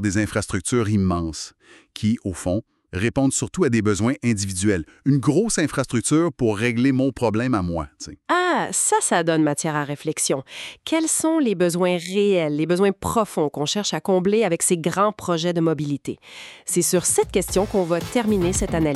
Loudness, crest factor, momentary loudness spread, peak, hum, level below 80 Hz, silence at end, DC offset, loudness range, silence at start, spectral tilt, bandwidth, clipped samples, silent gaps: -21 LUFS; 18 dB; 8 LU; -4 dBFS; none; -44 dBFS; 0 s; under 0.1%; 2 LU; 0 s; -4.5 dB/octave; 14.5 kHz; under 0.1%; none